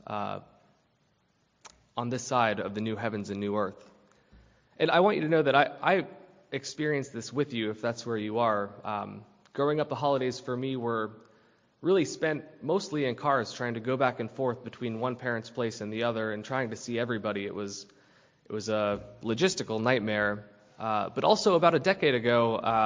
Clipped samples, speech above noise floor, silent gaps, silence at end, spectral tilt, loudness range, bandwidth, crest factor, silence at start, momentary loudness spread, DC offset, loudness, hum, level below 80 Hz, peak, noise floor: under 0.1%; 42 dB; none; 0 s; -5 dB/octave; 5 LU; 7.6 kHz; 22 dB; 0.1 s; 12 LU; under 0.1%; -29 LUFS; none; -66 dBFS; -8 dBFS; -71 dBFS